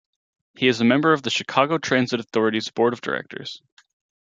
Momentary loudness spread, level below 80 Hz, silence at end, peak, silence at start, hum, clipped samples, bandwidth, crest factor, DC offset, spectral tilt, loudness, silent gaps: 15 LU; -68 dBFS; 0.65 s; -2 dBFS; 0.6 s; none; under 0.1%; 7.8 kHz; 20 dB; under 0.1%; -5 dB/octave; -21 LUFS; none